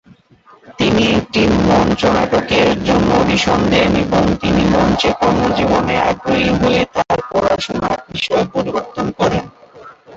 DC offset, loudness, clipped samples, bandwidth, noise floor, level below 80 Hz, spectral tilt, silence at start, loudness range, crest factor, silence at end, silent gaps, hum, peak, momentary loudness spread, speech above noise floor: under 0.1%; -15 LUFS; under 0.1%; 8 kHz; -47 dBFS; -32 dBFS; -5.5 dB/octave; 0.7 s; 3 LU; 14 dB; 0 s; none; none; 0 dBFS; 6 LU; 33 dB